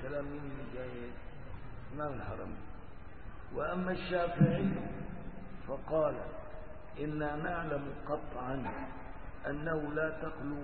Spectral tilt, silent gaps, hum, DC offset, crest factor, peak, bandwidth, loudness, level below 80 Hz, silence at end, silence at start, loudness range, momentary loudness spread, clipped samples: -6.5 dB/octave; none; none; 0.5%; 24 dB; -14 dBFS; 4.5 kHz; -37 LUFS; -50 dBFS; 0 s; 0 s; 8 LU; 16 LU; under 0.1%